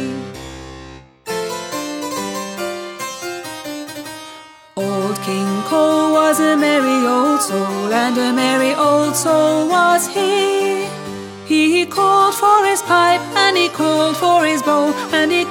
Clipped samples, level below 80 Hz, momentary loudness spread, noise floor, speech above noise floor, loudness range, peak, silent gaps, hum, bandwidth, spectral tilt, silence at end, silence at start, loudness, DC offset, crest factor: under 0.1%; -54 dBFS; 15 LU; -39 dBFS; 24 dB; 11 LU; 0 dBFS; none; none; 17.5 kHz; -3.5 dB/octave; 0 s; 0 s; -16 LUFS; under 0.1%; 16 dB